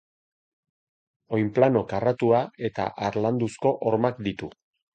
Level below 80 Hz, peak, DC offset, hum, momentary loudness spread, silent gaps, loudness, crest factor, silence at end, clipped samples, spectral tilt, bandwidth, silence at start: -58 dBFS; -6 dBFS; under 0.1%; none; 10 LU; none; -25 LUFS; 20 dB; 0.45 s; under 0.1%; -7.5 dB/octave; 9.2 kHz; 1.3 s